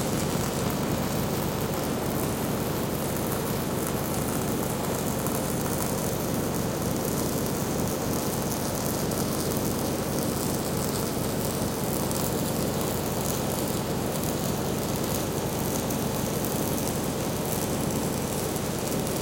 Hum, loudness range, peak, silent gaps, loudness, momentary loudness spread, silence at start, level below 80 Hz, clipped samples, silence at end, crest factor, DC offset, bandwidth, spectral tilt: none; 0 LU; -6 dBFS; none; -28 LUFS; 1 LU; 0 s; -46 dBFS; under 0.1%; 0 s; 22 dB; under 0.1%; 17.5 kHz; -4.5 dB/octave